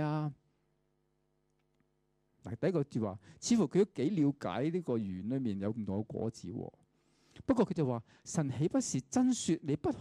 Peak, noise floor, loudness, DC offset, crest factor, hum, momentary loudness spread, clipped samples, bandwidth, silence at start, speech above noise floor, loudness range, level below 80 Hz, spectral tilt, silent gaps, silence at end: -18 dBFS; -77 dBFS; -34 LUFS; under 0.1%; 18 dB; none; 11 LU; under 0.1%; 11.5 kHz; 0 s; 44 dB; 4 LU; -68 dBFS; -6 dB/octave; none; 0 s